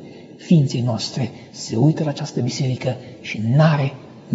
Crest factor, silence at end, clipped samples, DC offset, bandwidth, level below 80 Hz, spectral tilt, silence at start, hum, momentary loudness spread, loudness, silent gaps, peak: 18 dB; 0 s; under 0.1%; under 0.1%; 8 kHz; -62 dBFS; -6.5 dB/octave; 0 s; none; 15 LU; -20 LUFS; none; -2 dBFS